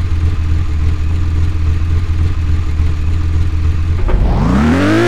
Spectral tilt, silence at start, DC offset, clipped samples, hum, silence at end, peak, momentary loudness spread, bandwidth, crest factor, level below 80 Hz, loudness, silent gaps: -7.5 dB/octave; 0 s; under 0.1%; under 0.1%; none; 0 s; 0 dBFS; 5 LU; 8.8 kHz; 12 dB; -16 dBFS; -15 LUFS; none